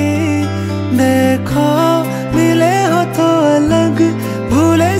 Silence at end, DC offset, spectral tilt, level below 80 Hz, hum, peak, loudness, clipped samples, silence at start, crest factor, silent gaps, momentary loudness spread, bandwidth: 0 s; under 0.1%; -6 dB/octave; -38 dBFS; none; 0 dBFS; -13 LUFS; under 0.1%; 0 s; 12 dB; none; 5 LU; 16 kHz